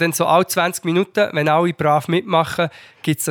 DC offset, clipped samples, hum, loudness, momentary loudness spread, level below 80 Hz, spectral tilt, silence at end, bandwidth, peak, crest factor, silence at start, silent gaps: under 0.1%; under 0.1%; none; -18 LUFS; 7 LU; -64 dBFS; -4.5 dB/octave; 0 s; over 20 kHz; -4 dBFS; 14 dB; 0 s; none